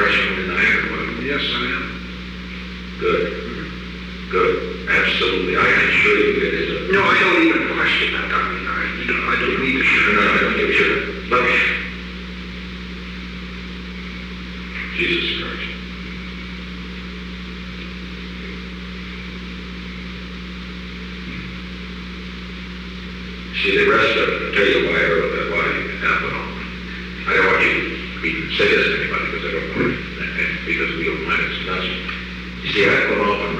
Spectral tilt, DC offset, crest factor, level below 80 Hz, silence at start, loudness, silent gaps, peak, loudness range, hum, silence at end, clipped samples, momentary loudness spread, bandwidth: -5 dB/octave; under 0.1%; 16 dB; -36 dBFS; 0 s; -18 LUFS; none; -4 dBFS; 15 LU; none; 0 s; under 0.1%; 17 LU; 10.5 kHz